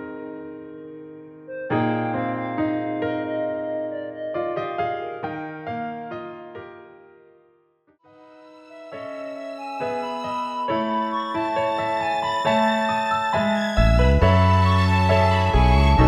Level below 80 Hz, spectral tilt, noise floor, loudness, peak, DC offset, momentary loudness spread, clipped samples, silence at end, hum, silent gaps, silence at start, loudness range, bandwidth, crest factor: -30 dBFS; -7 dB/octave; -62 dBFS; -22 LUFS; -4 dBFS; under 0.1%; 20 LU; under 0.1%; 0 s; none; none; 0 s; 18 LU; 10.5 kHz; 20 dB